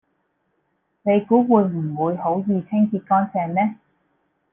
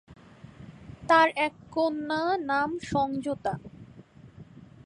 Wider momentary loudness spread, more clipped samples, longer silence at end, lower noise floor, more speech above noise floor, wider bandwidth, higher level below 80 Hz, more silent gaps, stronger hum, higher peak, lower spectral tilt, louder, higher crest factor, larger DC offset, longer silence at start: second, 7 LU vs 26 LU; neither; first, 0.8 s vs 0.2 s; first, -70 dBFS vs -51 dBFS; first, 51 dB vs 24 dB; second, 3.4 kHz vs 11 kHz; about the same, -64 dBFS vs -60 dBFS; neither; neither; first, -2 dBFS vs -8 dBFS; first, -12 dB/octave vs -5.5 dB/octave; first, -20 LUFS vs -27 LUFS; about the same, 18 dB vs 22 dB; neither; first, 1.05 s vs 0.1 s